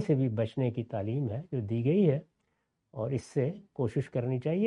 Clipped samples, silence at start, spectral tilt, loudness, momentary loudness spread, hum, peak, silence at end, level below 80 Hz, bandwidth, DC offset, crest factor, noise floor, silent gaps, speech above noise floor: under 0.1%; 0 s; -9 dB/octave; -31 LUFS; 9 LU; none; -14 dBFS; 0 s; -68 dBFS; 10.5 kHz; under 0.1%; 16 dB; -79 dBFS; none; 49 dB